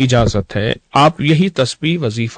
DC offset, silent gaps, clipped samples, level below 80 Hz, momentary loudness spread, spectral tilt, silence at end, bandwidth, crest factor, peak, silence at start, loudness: under 0.1%; none; under 0.1%; -34 dBFS; 6 LU; -6 dB/octave; 0 s; 9.4 kHz; 12 dB; -2 dBFS; 0 s; -15 LUFS